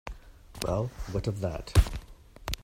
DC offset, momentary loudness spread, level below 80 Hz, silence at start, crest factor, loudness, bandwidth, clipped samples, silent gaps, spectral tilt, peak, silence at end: under 0.1%; 19 LU; -34 dBFS; 0.05 s; 22 dB; -31 LUFS; 16 kHz; under 0.1%; none; -5.5 dB/octave; -8 dBFS; 0 s